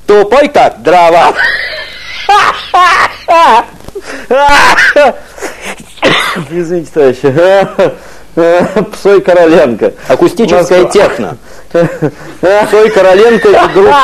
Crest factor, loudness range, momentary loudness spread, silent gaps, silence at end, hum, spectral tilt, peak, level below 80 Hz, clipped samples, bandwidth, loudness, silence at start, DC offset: 8 dB; 2 LU; 14 LU; none; 0 s; none; -4.5 dB/octave; 0 dBFS; -36 dBFS; 5%; 13.5 kHz; -7 LUFS; 0.1 s; 2%